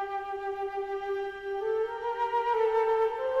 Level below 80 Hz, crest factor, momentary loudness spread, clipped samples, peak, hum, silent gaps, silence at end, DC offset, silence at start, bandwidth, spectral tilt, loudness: -64 dBFS; 12 dB; 8 LU; under 0.1%; -18 dBFS; none; none; 0 s; under 0.1%; 0 s; 7.2 kHz; -4.5 dB/octave; -30 LUFS